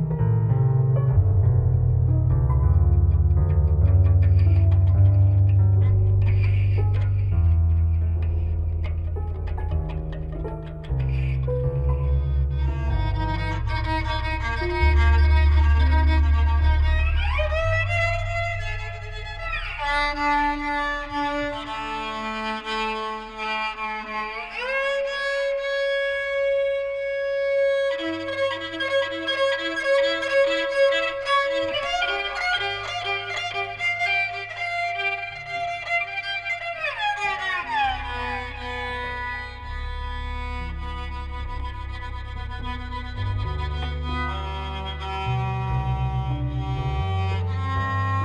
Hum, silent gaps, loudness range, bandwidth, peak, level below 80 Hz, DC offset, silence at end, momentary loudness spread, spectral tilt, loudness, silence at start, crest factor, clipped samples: none; none; 10 LU; 9.2 kHz; -8 dBFS; -28 dBFS; under 0.1%; 0 s; 12 LU; -6.5 dB/octave; -23 LUFS; 0 s; 14 dB; under 0.1%